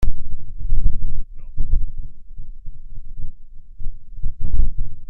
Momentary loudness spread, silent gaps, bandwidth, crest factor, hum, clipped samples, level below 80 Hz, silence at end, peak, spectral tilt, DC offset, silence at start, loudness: 17 LU; none; 0.6 kHz; 12 dB; none; under 0.1%; -22 dBFS; 0.05 s; 0 dBFS; -9 dB/octave; under 0.1%; 0 s; -31 LUFS